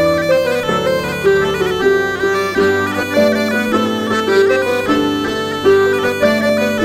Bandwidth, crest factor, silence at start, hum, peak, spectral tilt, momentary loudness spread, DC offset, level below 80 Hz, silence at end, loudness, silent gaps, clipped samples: 16 kHz; 12 dB; 0 s; none; -2 dBFS; -5 dB/octave; 4 LU; under 0.1%; -44 dBFS; 0 s; -14 LUFS; none; under 0.1%